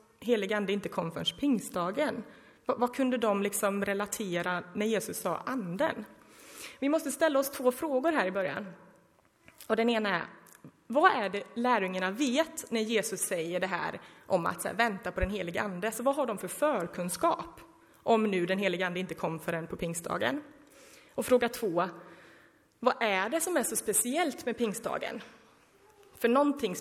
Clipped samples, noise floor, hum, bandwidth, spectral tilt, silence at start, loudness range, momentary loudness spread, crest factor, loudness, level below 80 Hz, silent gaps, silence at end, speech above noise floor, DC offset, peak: under 0.1%; -65 dBFS; none; 16 kHz; -4 dB/octave; 0.2 s; 3 LU; 8 LU; 22 dB; -31 LUFS; -56 dBFS; none; 0 s; 35 dB; under 0.1%; -8 dBFS